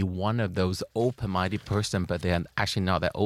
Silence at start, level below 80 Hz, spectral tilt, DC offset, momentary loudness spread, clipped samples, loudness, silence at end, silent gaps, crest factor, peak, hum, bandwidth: 0 s; -48 dBFS; -6 dB/octave; under 0.1%; 2 LU; under 0.1%; -28 LUFS; 0 s; none; 18 dB; -8 dBFS; none; 14.5 kHz